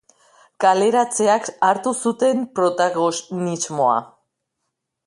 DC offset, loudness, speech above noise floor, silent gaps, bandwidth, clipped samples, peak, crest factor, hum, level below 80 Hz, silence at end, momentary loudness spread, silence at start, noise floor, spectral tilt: under 0.1%; -19 LUFS; 59 dB; none; 11.5 kHz; under 0.1%; -4 dBFS; 18 dB; none; -70 dBFS; 1 s; 7 LU; 0.6 s; -78 dBFS; -4 dB/octave